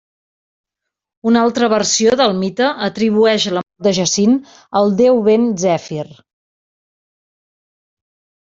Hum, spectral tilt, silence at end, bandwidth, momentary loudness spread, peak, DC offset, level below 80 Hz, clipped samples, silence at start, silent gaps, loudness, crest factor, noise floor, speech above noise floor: none; -4 dB/octave; 2.3 s; 8 kHz; 8 LU; -2 dBFS; under 0.1%; -56 dBFS; under 0.1%; 1.25 s; none; -15 LUFS; 14 dB; -81 dBFS; 67 dB